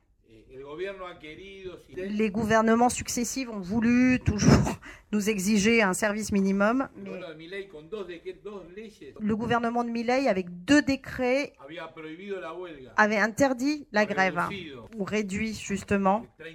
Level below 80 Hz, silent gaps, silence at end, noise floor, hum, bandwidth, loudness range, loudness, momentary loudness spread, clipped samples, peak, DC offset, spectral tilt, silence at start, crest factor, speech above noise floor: -48 dBFS; none; 0 s; -57 dBFS; none; 18 kHz; 6 LU; -26 LUFS; 19 LU; under 0.1%; -6 dBFS; under 0.1%; -5 dB/octave; 0.5 s; 22 dB; 30 dB